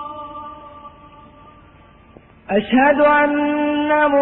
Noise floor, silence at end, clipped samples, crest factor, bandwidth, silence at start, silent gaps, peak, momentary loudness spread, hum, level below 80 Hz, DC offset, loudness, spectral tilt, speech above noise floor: -47 dBFS; 0 s; under 0.1%; 14 dB; 4.1 kHz; 0 s; none; -4 dBFS; 22 LU; none; -50 dBFS; under 0.1%; -16 LUFS; -10 dB/octave; 32 dB